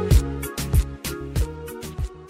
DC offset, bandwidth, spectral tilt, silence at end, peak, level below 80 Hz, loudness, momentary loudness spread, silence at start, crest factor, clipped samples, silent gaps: under 0.1%; 16 kHz; -5.5 dB/octave; 0 s; -6 dBFS; -26 dBFS; -26 LUFS; 12 LU; 0 s; 18 dB; under 0.1%; none